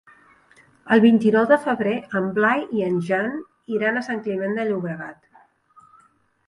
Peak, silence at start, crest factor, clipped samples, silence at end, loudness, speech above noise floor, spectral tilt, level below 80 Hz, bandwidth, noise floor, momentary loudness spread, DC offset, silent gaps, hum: -4 dBFS; 0.85 s; 18 dB; under 0.1%; 1.35 s; -21 LUFS; 39 dB; -7.5 dB/octave; -68 dBFS; 11 kHz; -59 dBFS; 13 LU; under 0.1%; none; none